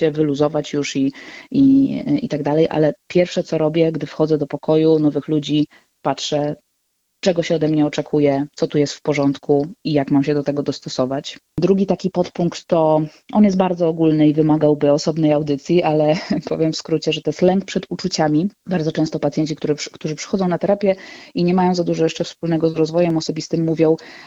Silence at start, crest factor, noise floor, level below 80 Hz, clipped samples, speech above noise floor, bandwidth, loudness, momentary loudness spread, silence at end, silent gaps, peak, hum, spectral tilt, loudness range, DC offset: 0 s; 18 dB; -69 dBFS; -54 dBFS; under 0.1%; 52 dB; 8 kHz; -18 LUFS; 7 LU; 0 s; none; 0 dBFS; none; -6.5 dB/octave; 4 LU; under 0.1%